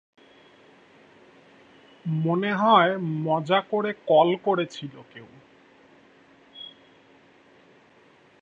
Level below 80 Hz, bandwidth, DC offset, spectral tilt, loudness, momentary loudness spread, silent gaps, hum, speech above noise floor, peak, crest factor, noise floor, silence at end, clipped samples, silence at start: -74 dBFS; 7.8 kHz; under 0.1%; -7 dB/octave; -23 LUFS; 23 LU; none; none; 34 dB; -4 dBFS; 22 dB; -57 dBFS; 1.7 s; under 0.1%; 2.05 s